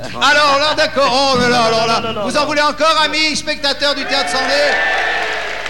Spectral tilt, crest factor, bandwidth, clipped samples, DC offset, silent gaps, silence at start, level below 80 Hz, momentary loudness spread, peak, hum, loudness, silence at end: -2.5 dB/octave; 14 dB; 16.5 kHz; under 0.1%; 3%; none; 0 s; -44 dBFS; 5 LU; 0 dBFS; none; -13 LUFS; 0 s